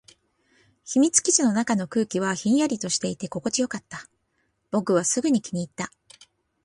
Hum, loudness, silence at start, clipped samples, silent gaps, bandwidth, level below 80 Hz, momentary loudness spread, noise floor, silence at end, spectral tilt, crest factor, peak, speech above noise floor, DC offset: none; -23 LUFS; 0.85 s; under 0.1%; none; 11.5 kHz; -66 dBFS; 14 LU; -72 dBFS; 0.75 s; -3.5 dB/octave; 20 dB; -4 dBFS; 48 dB; under 0.1%